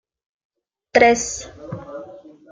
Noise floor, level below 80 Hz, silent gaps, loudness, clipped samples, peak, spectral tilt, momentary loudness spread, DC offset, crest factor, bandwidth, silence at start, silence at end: -41 dBFS; -52 dBFS; none; -17 LUFS; under 0.1%; -2 dBFS; -3 dB/octave; 21 LU; under 0.1%; 20 dB; 9.6 kHz; 0.95 s; 0.3 s